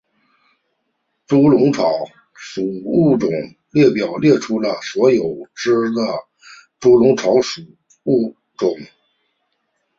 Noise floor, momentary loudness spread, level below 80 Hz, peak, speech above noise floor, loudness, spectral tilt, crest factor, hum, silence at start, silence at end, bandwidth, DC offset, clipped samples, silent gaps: -71 dBFS; 13 LU; -58 dBFS; 0 dBFS; 55 dB; -17 LUFS; -6.5 dB/octave; 16 dB; none; 1.3 s; 1.15 s; 7.6 kHz; under 0.1%; under 0.1%; none